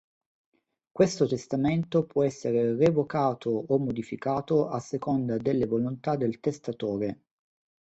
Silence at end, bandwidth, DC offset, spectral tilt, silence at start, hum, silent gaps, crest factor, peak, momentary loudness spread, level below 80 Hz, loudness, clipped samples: 0.7 s; 8.2 kHz; under 0.1%; -7.5 dB/octave; 0.95 s; none; none; 20 dB; -8 dBFS; 8 LU; -62 dBFS; -28 LUFS; under 0.1%